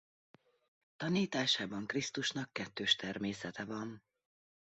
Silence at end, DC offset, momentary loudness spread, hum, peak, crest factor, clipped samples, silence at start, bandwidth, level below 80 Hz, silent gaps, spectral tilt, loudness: 0.75 s; under 0.1%; 10 LU; none; -16 dBFS; 22 dB; under 0.1%; 1 s; 8 kHz; -74 dBFS; none; -2.5 dB/octave; -36 LUFS